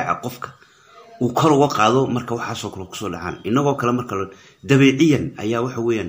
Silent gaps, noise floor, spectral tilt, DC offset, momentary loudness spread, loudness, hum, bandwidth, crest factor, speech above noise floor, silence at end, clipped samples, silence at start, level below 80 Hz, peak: none; -48 dBFS; -6 dB/octave; under 0.1%; 15 LU; -19 LUFS; none; 16 kHz; 18 dB; 29 dB; 0 s; under 0.1%; 0 s; -54 dBFS; -2 dBFS